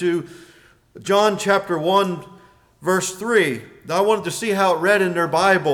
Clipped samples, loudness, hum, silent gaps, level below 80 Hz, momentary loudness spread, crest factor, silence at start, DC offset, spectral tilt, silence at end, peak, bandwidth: under 0.1%; -19 LUFS; none; none; -62 dBFS; 11 LU; 14 dB; 0 s; under 0.1%; -4 dB/octave; 0 s; -6 dBFS; 19 kHz